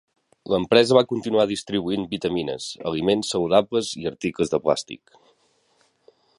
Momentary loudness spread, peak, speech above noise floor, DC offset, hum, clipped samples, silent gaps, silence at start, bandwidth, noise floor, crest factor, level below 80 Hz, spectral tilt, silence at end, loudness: 11 LU; -2 dBFS; 42 dB; under 0.1%; none; under 0.1%; none; 0.45 s; 11.5 kHz; -64 dBFS; 22 dB; -56 dBFS; -5 dB/octave; 1.4 s; -22 LUFS